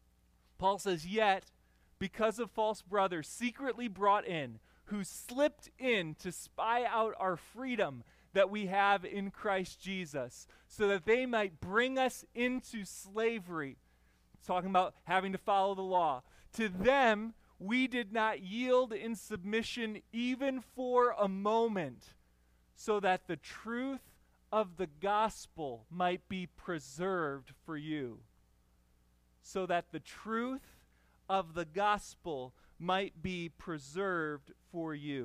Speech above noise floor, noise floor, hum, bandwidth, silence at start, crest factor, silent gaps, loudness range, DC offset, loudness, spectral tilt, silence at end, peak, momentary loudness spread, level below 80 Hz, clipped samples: 35 dB; -70 dBFS; 60 Hz at -70 dBFS; 15.5 kHz; 0.6 s; 20 dB; none; 7 LU; under 0.1%; -35 LUFS; -4.5 dB/octave; 0 s; -14 dBFS; 13 LU; -64 dBFS; under 0.1%